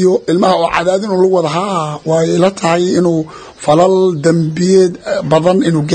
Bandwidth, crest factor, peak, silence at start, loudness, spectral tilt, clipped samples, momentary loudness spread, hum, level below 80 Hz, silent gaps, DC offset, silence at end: 9.4 kHz; 12 dB; 0 dBFS; 0 s; -12 LUFS; -6 dB/octave; under 0.1%; 6 LU; none; -48 dBFS; none; under 0.1%; 0 s